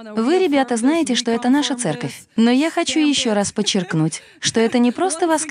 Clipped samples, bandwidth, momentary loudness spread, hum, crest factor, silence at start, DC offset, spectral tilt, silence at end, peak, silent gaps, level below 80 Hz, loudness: under 0.1%; 13.5 kHz; 6 LU; none; 14 dB; 0 s; under 0.1%; -4 dB/octave; 0 s; -4 dBFS; none; -62 dBFS; -18 LUFS